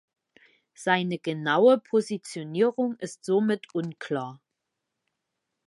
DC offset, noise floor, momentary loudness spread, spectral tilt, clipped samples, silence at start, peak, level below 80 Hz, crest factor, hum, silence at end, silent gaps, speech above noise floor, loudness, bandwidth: under 0.1%; -83 dBFS; 13 LU; -5.5 dB/octave; under 0.1%; 0.8 s; -6 dBFS; -80 dBFS; 20 dB; none; 1.3 s; none; 58 dB; -26 LUFS; 11.5 kHz